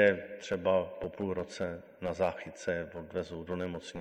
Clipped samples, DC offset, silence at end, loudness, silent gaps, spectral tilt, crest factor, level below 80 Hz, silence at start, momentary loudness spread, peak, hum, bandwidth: under 0.1%; under 0.1%; 0 s; -35 LUFS; none; -5.5 dB/octave; 22 dB; -58 dBFS; 0 s; 9 LU; -12 dBFS; none; 10 kHz